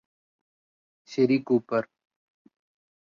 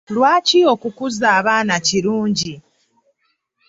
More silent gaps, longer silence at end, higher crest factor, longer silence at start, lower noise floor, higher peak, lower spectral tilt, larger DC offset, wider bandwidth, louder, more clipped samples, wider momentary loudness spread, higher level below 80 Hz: neither; first, 1.25 s vs 1.1 s; about the same, 20 dB vs 16 dB; first, 1.1 s vs 0.1 s; first, under -90 dBFS vs -68 dBFS; second, -10 dBFS vs -2 dBFS; first, -7.5 dB/octave vs -3.5 dB/octave; neither; about the same, 7.4 kHz vs 8 kHz; second, -26 LUFS vs -16 LUFS; neither; first, 12 LU vs 9 LU; second, -74 dBFS vs -58 dBFS